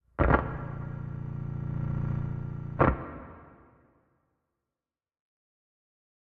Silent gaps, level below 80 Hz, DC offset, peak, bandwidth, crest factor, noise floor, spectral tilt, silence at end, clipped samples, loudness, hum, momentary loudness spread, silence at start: none; -40 dBFS; under 0.1%; -8 dBFS; 4.4 kHz; 26 dB; under -90 dBFS; -8 dB/octave; 2.75 s; under 0.1%; -31 LUFS; none; 16 LU; 0.2 s